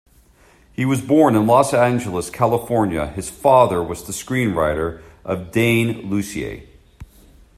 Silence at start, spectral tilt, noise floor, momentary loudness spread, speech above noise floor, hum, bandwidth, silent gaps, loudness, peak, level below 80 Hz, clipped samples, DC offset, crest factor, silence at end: 0.8 s; -6 dB/octave; -52 dBFS; 13 LU; 34 dB; none; 15.5 kHz; none; -18 LUFS; 0 dBFS; -44 dBFS; under 0.1%; under 0.1%; 18 dB; 0.55 s